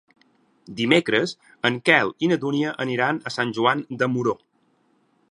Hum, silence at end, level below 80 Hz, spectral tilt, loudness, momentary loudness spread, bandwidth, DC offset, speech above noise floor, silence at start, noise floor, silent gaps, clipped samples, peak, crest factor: none; 0.95 s; -68 dBFS; -5.5 dB/octave; -22 LUFS; 9 LU; 11 kHz; under 0.1%; 43 dB; 0.7 s; -65 dBFS; none; under 0.1%; -2 dBFS; 22 dB